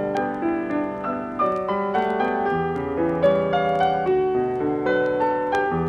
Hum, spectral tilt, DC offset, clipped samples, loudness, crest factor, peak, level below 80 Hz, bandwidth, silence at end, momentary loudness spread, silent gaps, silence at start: none; -7.5 dB/octave; under 0.1%; under 0.1%; -22 LUFS; 16 dB; -6 dBFS; -50 dBFS; 7.4 kHz; 0 s; 5 LU; none; 0 s